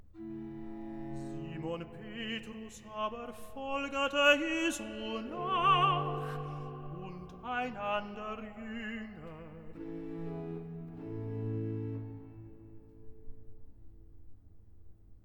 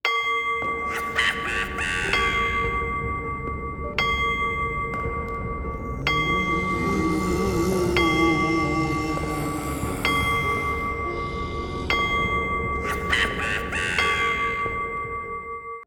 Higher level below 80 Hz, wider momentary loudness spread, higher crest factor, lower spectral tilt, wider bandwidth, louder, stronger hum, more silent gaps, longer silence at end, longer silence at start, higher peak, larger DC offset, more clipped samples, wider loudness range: second, -58 dBFS vs -36 dBFS; first, 19 LU vs 9 LU; first, 24 dB vs 18 dB; about the same, -5 dB/octave vs -4.5 dB/octave; about the same, 19 kHz vs over 20 kHz; second, -35 LUFS vs -24 LUFS; neither; neither; about the same, 0.05 s vs 0 s; about the same, 0 s vs 0.05 s; second, -12 dBFS vs -6 dBFS; neither; neither; first, 12 LU vs 3 LU